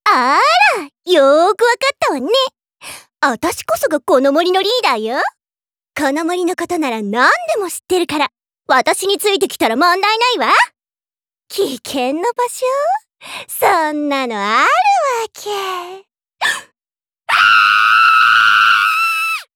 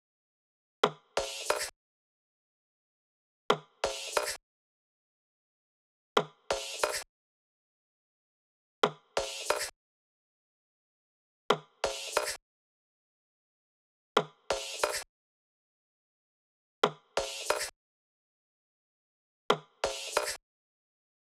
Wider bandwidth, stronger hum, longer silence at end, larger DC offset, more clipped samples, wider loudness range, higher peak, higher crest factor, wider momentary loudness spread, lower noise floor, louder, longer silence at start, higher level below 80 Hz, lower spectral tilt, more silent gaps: first, over 20 kHz vs 17 kHz; neither; second, 0.15 s vs 0.95 s; neither; neither; first, 5 LU vs 2 LU; first, -2 dBFS vs -10 dBFS; second, 14 dB vs 28 dB; first, 13 LU vs 7 LU; about the same, under -90 dBFS vs under -90 dBFS; first, -14 LUFS vs -33 LUFS; second, 0.05 s vs 0.85 s; about the same, -64 dBFS vs -66 dBFS; about the same, -2 dB/octave vs -1.5 dB/octave; second, none vs 1.76-3.49 s, 4.43-6.16 s, 7.09-8.82 s, 9.76-11.49 s, 12.42-14.15 s, 15.09-16.82 s, 17.76-19.49 s